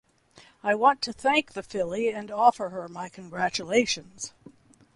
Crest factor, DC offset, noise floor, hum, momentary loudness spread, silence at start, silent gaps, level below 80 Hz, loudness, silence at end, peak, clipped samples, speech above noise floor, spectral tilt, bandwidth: 22 dB; under 0.1%; -56 dBFS; none; 16 LU; 0.65 s; none; -64 dBFS; -26 LUFS; 0.65 s; -6 dBFS; under 0.1%; 30 dB; -3 dB/octave; 11.5 kHz